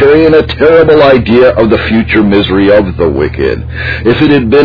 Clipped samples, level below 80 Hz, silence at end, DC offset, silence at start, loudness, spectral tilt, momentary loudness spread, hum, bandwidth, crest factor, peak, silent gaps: 3%; -24 dBFS; 0 s; under 0.1%; 0 s; -7 LUFS; -9 dB/octave; 8 LU; none; 5.4 kHz; 6 dB; 0 dBFS; none